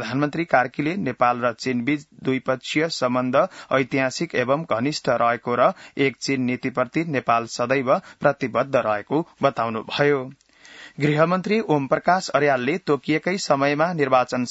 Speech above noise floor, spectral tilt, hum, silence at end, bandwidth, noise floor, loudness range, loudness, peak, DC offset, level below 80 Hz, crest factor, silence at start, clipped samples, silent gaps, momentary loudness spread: 24 dB; -5.5 dB/octave; none; 0 s; 8 kHz; -45 dBFS; 2 LU; -22 LUFS; -4 dBFS; under 0.1%; -64 dBFS; 18 dB; 0 s; under 0.1%; none; 5 LU